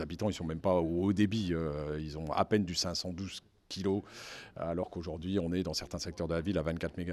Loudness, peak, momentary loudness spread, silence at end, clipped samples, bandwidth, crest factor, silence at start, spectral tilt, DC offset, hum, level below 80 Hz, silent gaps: -34 LUFS; -12 dBFS; 11 LU; 0 s; under 0.1%; 14 kHz; 22 dB; 0 s; -5.5 dB/octave; under 0.1%; none; -52 dBFS; none